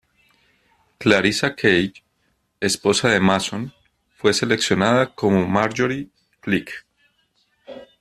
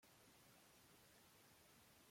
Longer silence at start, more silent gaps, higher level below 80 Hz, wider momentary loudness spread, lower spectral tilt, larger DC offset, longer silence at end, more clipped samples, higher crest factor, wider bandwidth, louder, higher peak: first, 1 s vs 0 s; neither; first, -56 dBFS vs -88 dBFS; first, 18 LU vs 0 LU; first, -4.5 dB/octave vs -2.5 dB/octave; neither; first, 0.15 s vs 0 s; neither; first, 22 dB vs 14 dB; second, 14 kHz vs 16.5 kHz; first, -19 LUFS vs -69 LUFS; first, 0 dBFS vs -56 dBFS